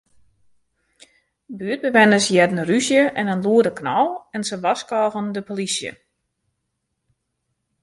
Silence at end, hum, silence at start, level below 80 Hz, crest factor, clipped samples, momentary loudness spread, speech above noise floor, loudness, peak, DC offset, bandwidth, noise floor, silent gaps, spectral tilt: 1.9 s; none; 1.5 s; -64 dBFS; 20 dB; under 0.1%; 13 LU; 57 dB; -19 LUFS; -2 dBFS; under 0.1%; 11.5 kHz; -76 dBFS; none; -4 dB/octave